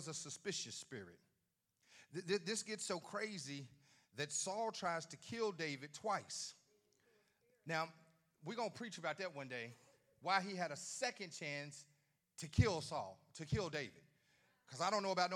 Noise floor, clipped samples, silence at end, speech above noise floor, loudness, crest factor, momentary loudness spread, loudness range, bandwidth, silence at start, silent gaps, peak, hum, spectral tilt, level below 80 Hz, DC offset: -86 dBFS; under 0.1%; 0 s; 43 dB; -43 LUFS; 26 dB; 15 LU; 5 LU; 15 kHz; 0 s; none; -20 dBFS; none; -3.5 dB/octave; -66 dBFS; under 0.1%